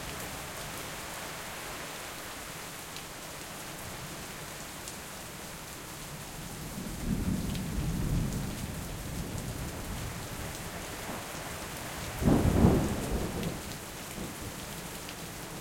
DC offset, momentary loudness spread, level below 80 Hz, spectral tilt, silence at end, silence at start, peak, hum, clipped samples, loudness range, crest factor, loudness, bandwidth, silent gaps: under 0.1%; 10 LU; -44 dBFS; -5 dB/octave; 0 s; 0 s; -8 dBFS; none; under 0.1%; 10 LU; 26 dB; -35 LUFS; 17 kHz; none